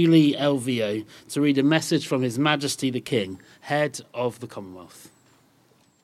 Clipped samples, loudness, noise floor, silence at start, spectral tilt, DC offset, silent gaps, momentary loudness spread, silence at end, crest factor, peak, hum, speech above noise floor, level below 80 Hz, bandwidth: under 0.1%; -24 LUFS; -61 dBFS; 0 s; -5.5 dB/octave; under 0.1%; none; 18 LU; 0.95 s; 20 dB; -4 dBFS; none; 37 dB; -72 dBFS; 13.5 kHz